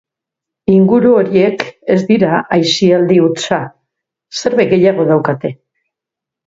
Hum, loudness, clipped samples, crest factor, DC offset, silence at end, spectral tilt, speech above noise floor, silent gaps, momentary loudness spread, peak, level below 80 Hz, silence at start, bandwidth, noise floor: none; -12 LUFS; under 0.1%; 12 dB; under 0.1%; 0.9 s; -6 dB/octave; 72 dB; none; 11 LU; 0 dBFS; -54 dBFS; 0.7 s; 7.8 kHz; -83 dBFS